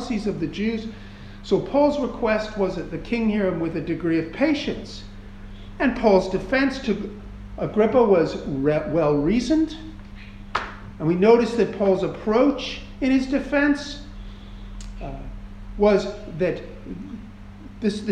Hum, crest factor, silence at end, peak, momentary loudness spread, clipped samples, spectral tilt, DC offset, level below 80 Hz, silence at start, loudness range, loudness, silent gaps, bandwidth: none; 20 dB; 0 s; -4 dBFS; 22 LU; under 0.1%; -6.5 dB/octave; under 0.1%; -40 dBFS; 0 s; 5 LU; -22 LUFS; none; 10 kHz